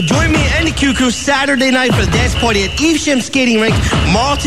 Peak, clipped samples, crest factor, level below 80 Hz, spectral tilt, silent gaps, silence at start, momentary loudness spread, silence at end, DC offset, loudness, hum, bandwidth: 0 dBFS; under 0.1%; 12 dB; -24 dBFS; -4.5 dB/octave; none; 0 s; 2 LU; 0 s; 1%; -12 LUFS; none; 14.5 kHz